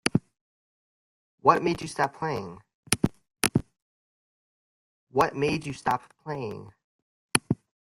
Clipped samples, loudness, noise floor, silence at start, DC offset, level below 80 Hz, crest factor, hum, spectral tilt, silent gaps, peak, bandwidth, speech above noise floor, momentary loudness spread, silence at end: under 0.1%; -28 LUFS; under -90 dBFS; 0.05 s; under 0.1%; -56 dBFS; 30 dB; none; -4 dB/octave; 0.41-1.38 s, 2.74-2.83 s, 3.82-5.07 s, 6.84-7.29 s; 0 dBFS; 15.5 kHz; over 63 dB; 11 LU; 0.3 s